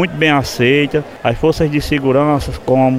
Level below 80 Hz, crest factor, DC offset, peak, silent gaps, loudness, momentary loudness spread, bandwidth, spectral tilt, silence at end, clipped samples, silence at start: -32 dBFS; 14 dB; under 0.1%; 0 dBFS; none; -14 LUFS; 5 LU; 16 kHz; -6 dB/octave; 0 s; under 0.1%; 0 s